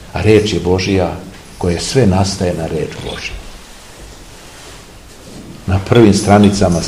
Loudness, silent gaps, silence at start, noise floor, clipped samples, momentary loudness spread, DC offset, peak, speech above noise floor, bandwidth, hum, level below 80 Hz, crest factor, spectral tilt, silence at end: -13 LUFS; none; 0 s; -36 dBFS; 0.5%; 26 LU; 0.4%; 0 dBFS; 24 dB; 15 kHz; none; -34 dBFS; 14 dB; -6 dB/octave; 0 s